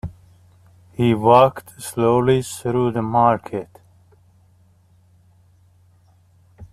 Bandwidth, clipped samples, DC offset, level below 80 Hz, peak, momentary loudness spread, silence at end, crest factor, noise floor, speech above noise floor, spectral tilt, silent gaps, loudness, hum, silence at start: 14 kHz; under 0.1%; under 0.1%; -52 dBFS; -2 dBFS; 19 LU; 0.1 s; 20 dB; -55 dBFS; 37 dB; -6.5 dB/octave; none; -18 LUFS; none; 0.05 s